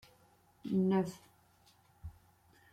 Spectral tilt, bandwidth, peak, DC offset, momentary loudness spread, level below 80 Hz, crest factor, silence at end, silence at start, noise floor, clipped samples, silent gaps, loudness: -8 dB/octave; 13 kHz; -20 dBFS; under 0.1%; 23 LU; -64 dBFS; 18 dB; 0.6 s; 0.65 s; -67 dBFS; under 0.1%; none; -34 LUFS